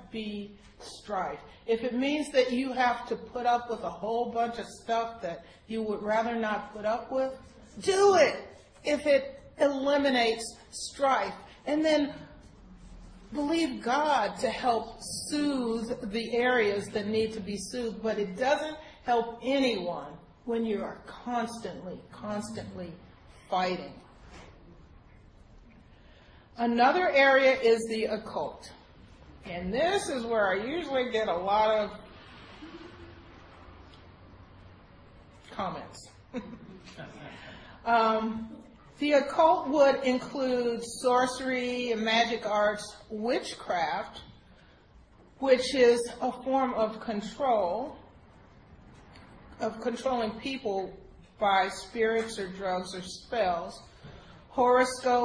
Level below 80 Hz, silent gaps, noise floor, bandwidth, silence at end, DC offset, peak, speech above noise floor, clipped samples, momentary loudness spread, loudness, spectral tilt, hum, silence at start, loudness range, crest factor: -58 dBFS; none; -57 dBFS; 10.5 kHz; 0 s; under 0.1%; -10 dBFS; 28 dB; under 0.1%; 20 LU; -29 LUFS; -4 dB/octave; none; 0 s; 10 LU; 20 dB